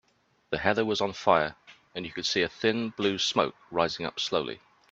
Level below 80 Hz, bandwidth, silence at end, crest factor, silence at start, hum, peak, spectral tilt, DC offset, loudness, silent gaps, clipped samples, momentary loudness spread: -62 dBFS; 8.2 kHz; 0.35 s; 24 dB; 0.5 s; none; -6 dBFS; -3.5 dB/octave; under 0.1%; -28 LUFS; none; under 0.1%; 12 LU